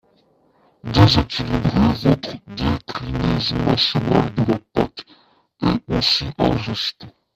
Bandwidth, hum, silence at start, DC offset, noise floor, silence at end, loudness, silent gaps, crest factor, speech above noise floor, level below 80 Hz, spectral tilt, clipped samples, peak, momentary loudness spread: 14 kHz; none; 0.85 s; under 0.1%; -58 dBFS; 0.25 s; -19 LUFS; none; 20 dB; 40 dB; -36 dBFS; -6.5 dB/octave; under 0.1%; 0 dBFS; 10 LU